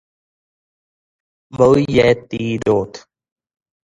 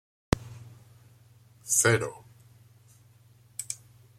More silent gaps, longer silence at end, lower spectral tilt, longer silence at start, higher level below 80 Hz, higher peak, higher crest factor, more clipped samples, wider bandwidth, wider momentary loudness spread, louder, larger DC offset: neither; first, 0.9 s vs 0.45 s; first, -6.5 dB/octave vs -3.5 dB/octave; first, 1.5 s vs 0.35 s; about the same, -46 dBFS vs -50 dBFS; first, 0 dBFS vs -4 dBFS; second, 18 dB vs 28 dB; neither; second, 10.5 kHz vs 16 kHz; second, 13 LU vs 25 LU; first, -16 LUFS vs -28 LUFS; neither